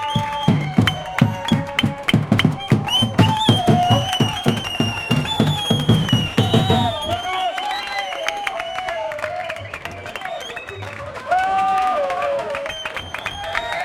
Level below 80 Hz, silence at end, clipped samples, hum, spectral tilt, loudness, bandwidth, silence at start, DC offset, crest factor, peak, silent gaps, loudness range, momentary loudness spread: -44 dBFS; 0 s; under 0.1%; none; -5.5 dB/octave; -19 LUFS; 17 kHz; 0 s; under 0.1%; 18 dB; -2 dBFS; none; 8 LU; 12 LU